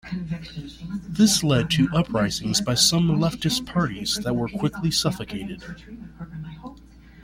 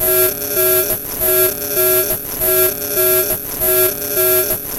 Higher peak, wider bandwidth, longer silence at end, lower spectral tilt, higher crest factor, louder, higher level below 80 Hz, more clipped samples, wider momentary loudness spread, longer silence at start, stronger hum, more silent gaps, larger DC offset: about the same, -4 dBFS vs -2 dBFS; about the same, 16 kHz vs 17.5 kHz; about the same, 0 s vs 0 s; first, -4 dB/octave vs -2.5 dB/octave; first, 20 dB vs 14 dB; second, -22 LUFS vs -13 LUFS; second, -46 dBFS vs -40 dBFS; neither; first, 20 LU vs 4 LU; about the same, 0.05 s vs 0 s; neither; neither; neither